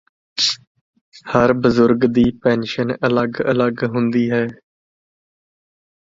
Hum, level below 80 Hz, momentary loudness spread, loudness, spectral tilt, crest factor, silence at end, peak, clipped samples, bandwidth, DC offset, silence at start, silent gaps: none; -48 dBFS; 7 LU; -17 LUFS; -5.5 dB/octave; 18 dB; 1.55 s; 0 dBFS; under 0.1%; 7.8 kHz; under 0.1%; 0.35 s; 0.67-0.75 s, 0.81-0.93 s, 1.01-1.12 s